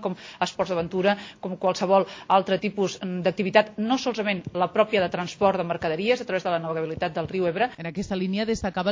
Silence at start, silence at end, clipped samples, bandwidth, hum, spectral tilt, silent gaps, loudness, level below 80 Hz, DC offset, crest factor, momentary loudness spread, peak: 0 s; 0 s; under 0.1%; 7.6 kHz; none; -5.5 dB/octave; none; -25 LUFS; -54 dBFS; under 0.1%; 22 dB; 7 LU; -2 dBFS